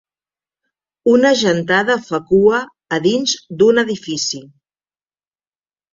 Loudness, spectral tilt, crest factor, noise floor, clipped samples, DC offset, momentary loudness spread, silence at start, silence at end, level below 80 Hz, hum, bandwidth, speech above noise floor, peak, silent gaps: -15 LUFS; -4 dB/octave; 16 dB; under -90 dBFS; under 0.1%; under 0.1%; 8 LU; 1.05 s; 1.5 s; -56 dBFS; none; 7.6 kHz; over 75 dB; -2 dBFS; none